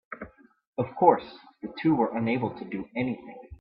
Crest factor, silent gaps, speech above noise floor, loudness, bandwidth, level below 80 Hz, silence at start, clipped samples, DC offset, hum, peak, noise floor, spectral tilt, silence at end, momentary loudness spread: 24 dB; 0.67-0.73 s; 20 dB; -27 LUFS; 5.4 kHz; -60 dBFS; 0.1 s; under 0.1%; under 0.1%; none; -4 dBFS; -47 dBFS; -11 dB/octave; 0.05 s; 20 LU